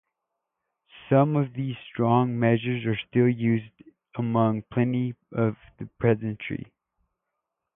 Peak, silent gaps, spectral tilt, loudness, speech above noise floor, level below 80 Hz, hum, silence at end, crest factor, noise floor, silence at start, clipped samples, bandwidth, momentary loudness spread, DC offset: -8 dBFS; none; -12 dB/octave; -25 LUFS; 58 dB; -60 dBFS; none; 1.15 s; 20 dB; -83 dBFS; 0.95 s; under 0.1%; 3.8 kHz; 11 LU; under 0.1%